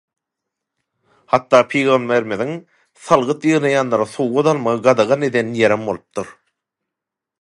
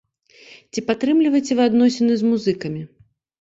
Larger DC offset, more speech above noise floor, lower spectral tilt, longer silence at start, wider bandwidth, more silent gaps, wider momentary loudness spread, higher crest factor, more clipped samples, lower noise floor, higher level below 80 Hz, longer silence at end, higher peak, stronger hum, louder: neither; first, 67 dB vs 31 dB; about the same, -5.5 dB/octave vs -5.5 dB/octave; first, 1.3 s vs 0.75 s; first, 11.5 kHz vs 7.8 kHz; neither; second, 11 LU vs 14 LU; about the same, 18 dB vs 14 dB; neither; first, -84 dBFS vs -49 dBFS; about the same, -62 dBFS vs -62 dBFS; first, 1.1 s vs 0.55 s; first, 0 dBFS vs -6 dBFS; neither; about the same, -17 LUFS vs -19 LUFS